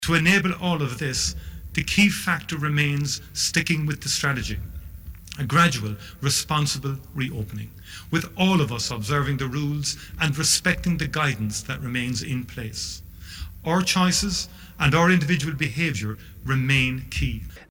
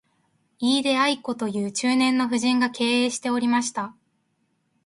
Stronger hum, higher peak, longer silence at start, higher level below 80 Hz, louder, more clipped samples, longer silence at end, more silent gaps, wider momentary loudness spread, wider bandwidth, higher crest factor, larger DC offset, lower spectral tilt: neither; about the same, -6 dBFS vs -8 dBFS; second, 0 s vs 0.6 s; first, -40 dBFS vs -70 dBFS; about the same, -23 LUFS vs -23 LUFS; neither; second, 0.05 s vs 0.95 s; neither; first, 15 LU vs 7 LU; first, 19 kHz vs 11.5 kHz; about the same, 18 dB vs 16 dB; neither; about the same, -4 dB/octave vs -3 dB/octave